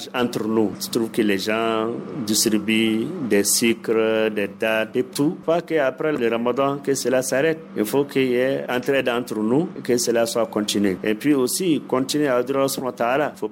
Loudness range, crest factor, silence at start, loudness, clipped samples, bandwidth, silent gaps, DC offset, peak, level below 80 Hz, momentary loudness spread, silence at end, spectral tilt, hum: 1 LU; 14 dB; 0 s; -21 LUFS; under 0.1%; 16.5 kHz; none; under 0.1%; -6 dBFS; -64 dBFS; 4 LU; 0 s; -4 dB/octave; none